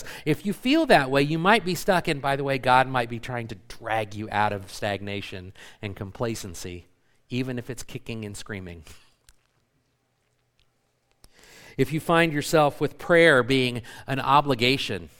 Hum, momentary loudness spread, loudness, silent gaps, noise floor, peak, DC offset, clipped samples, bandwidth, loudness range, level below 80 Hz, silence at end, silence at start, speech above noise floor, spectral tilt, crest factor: none; 18 LU; -23 LUFS; none; -71 dBFS; -2 dBFS; under 0.1%; under 0.1%; 18 kHz; 15 LU; -50 dBFS; 0.1 s; 0 s; 47 dB; -5 dB/octave; 22 dB